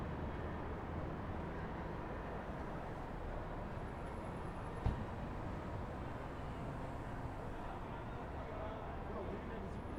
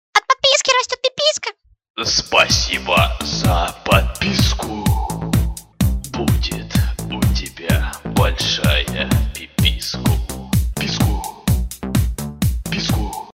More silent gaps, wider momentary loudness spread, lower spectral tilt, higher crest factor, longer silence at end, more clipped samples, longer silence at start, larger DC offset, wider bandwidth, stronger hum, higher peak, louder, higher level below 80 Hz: second, none vs 1.90-1.94 s; second, 3 LU vs 8 LU; first, -8 dB/octave vs -4 dB/octave; about the same, 20 dB vs 18 dB; about the same, 0 s vs 0 s; neither; second, 0 s vs 0.15 s; neither; second, 13.5 kHz vs 16 kHz; neither; second, -24 dBFS vs 0 dBFS; second, -46 LUFS vs -18 LUFS; second, -50 dBFS vs -26 dBFS